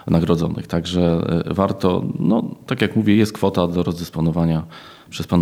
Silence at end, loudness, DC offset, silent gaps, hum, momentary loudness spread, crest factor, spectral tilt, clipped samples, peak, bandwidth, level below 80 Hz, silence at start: 0 s; -19 LUFS; under 0.1%; none; none; 8 LU; 18 dB; -7.5 dB/octave; under 0.1%; -2 dBFS; 15 kHz; -42 dBFS; 0.05 s